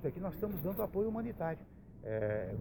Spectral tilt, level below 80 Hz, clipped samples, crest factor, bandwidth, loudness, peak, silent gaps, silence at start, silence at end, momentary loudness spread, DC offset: -10 dB/octave; -56 dBFS; under 0.1%; 14 dB; 17 kHz; -38 LUFS; -24 dBFS; none; 0 s; 0 s; 10 LU; under 0.1%